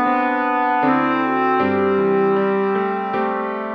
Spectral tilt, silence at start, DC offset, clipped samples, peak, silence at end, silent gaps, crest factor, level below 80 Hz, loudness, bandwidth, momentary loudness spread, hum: -8.5 dB/octave; 0 s; under 0.1%; under 0.1%; -6 dBFS; 0 s; none; 12 dB; -58 dBFS; -18 LUFS; 5.6 kHz; 4 LU; none